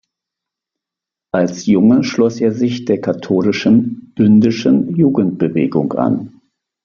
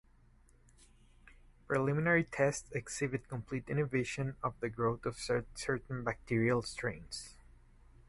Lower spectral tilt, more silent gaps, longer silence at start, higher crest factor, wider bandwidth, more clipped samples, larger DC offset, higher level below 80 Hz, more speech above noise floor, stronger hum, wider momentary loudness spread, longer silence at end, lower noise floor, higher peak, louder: first, -7 dB/octave vs -5.5 dB/octave; neither; second, 1.35 s vs 1.7 s; second, 14 dB vs 20 dB; second, 7.2 kHz vs 11.5 kHz; neither; neither; about the same, -54 dBFS vs -58 dBFS; first, 72 dB vs 29 dB; neither; second, 7 LU vs 10 LU; second, 0.55 s vs 0.75 s; first, -85 dBFS vs -64 dBFS; first, 0 dBFS vs -18 dBFS; first, -14 LUFS vs -36 LUFS